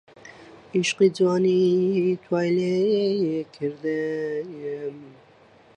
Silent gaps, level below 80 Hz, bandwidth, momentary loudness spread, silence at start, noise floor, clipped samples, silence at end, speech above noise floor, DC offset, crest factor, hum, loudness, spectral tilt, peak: none; -70 dBFS; 9.8 kHz; 12 LU; 0.25 s; -54 dBFS; under 0.1%; 0.65 s; 31 dB; under 0.1%; 16 dB; none; -23 LUFS; -6 dB/octave; -8 dBFS